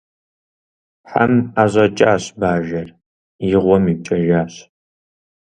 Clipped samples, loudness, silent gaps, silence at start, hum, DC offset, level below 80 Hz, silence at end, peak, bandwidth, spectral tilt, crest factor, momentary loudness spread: under 0.1%; -16 LUFS; 3.06-3.39 s; 1.05 s; none; under 0.1%; -46 dBFS; 0.95 s; 0 dBFS; 10 kHz; -7 dB/octave; 18 dB; 11 LU